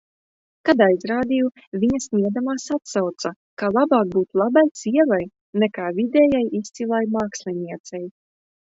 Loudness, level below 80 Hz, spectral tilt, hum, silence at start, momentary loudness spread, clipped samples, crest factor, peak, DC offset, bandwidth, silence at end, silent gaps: -21 LUFS; -58 dBFS; -5.5 dB/octave; none; 0.65 s; 12 LU; under 0.1%; 20 dB; -2 dBFS; under 0.1%; 8 kHz; 0.55 s; 1.67-1.72 s, 3.36-3.57 s, 4.71-4.75 s, 5.41-5.53 s, 7.80-7.84 s